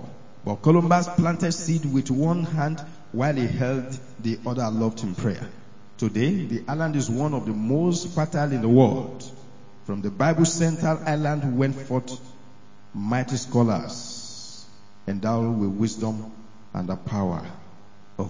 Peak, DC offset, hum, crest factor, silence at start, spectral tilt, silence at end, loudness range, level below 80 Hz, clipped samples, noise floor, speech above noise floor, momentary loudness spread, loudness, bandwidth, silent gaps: -4 dBFS; 0.9%; none; 22 dB; 0 s; -6.5 dB/octave; 0 s; 5 LU; -56 dBFS; under 0.1%; -52 dBFS; 28 dB; 16 LU; -24 LUFS; 7.8 kHz; none